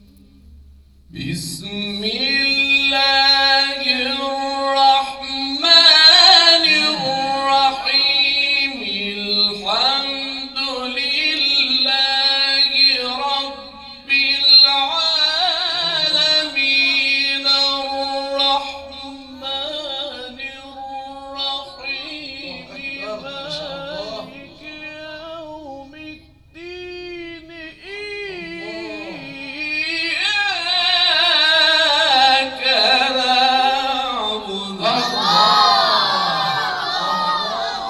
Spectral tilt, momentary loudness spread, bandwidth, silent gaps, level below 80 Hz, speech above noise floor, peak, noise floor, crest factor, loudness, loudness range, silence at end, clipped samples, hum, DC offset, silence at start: -1.5 dB/octave; 20 LU; 13.5 kHz; none; -52 dBFS; 21 dB; 0 dBFS; -46 dBFS; 18 dB; -14 LUFS; 19 LU; 0 s; under 0.1%; none; under 0.1%; 0.5 s